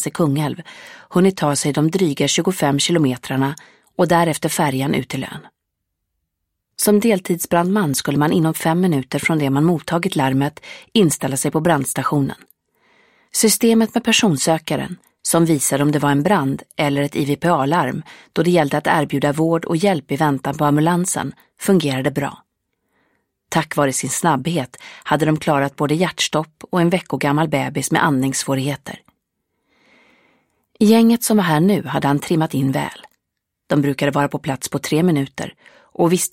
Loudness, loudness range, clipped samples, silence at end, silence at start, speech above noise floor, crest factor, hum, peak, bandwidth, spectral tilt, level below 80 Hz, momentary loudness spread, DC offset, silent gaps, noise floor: -18 LUFS; 4 LU; under 0.1%; 0.05 s; 0 s; 60 dB; 18 dB; none; 0 dBFS; 16.5 kHz; -5 dB/octave; -56 dBFS; 10 LU; under 0.1%; none; -78 dBFS